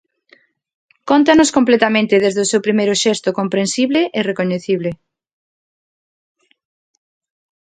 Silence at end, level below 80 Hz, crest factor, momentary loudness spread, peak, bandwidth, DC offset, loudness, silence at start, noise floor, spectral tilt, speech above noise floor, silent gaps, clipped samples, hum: 2.7 s; -58 dBFS; 18 dB; 9 LU; 0 dBFS; 9.6 kHz; under 0.1%; -15 LUFS; 1.05 s; -53 dBFS; -4 dB/octave; 39 dB; none; under 0.1%; none